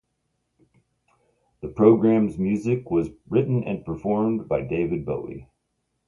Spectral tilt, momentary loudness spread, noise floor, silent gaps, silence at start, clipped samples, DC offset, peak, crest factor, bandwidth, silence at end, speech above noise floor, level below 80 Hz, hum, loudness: -10 dB/octave; 14 LU; -75 dBFS; none; 1.65 s; under 0.1%; under 0.1%; -4 dBFS; 20 dB; 7.2 kHz; 0.65 s; 53 dB; -52 dBFS; none; -23 LUFS